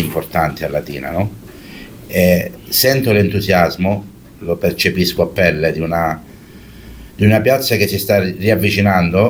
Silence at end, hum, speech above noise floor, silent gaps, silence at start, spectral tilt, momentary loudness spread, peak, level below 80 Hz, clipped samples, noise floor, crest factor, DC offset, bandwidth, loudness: 0 s; none; 23 dB; none; 0 s; -5.5 dB/octave; 11 LU; 0 dBFS; -40 dBFS; under 0.1%; -37 dBFS; 16 dB; under 0.1%; over 20 kHz; -15 LUFS